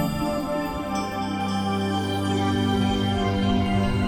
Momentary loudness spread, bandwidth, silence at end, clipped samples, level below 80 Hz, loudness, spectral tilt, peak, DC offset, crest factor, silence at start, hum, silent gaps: 5 LU; 17 kHz; 0 s; under 0.1%; -38 dBFS; -24 LUFS; -6 dB/octave; -10 dBFS; under 0.1%; 12 dB; 0 s; none; none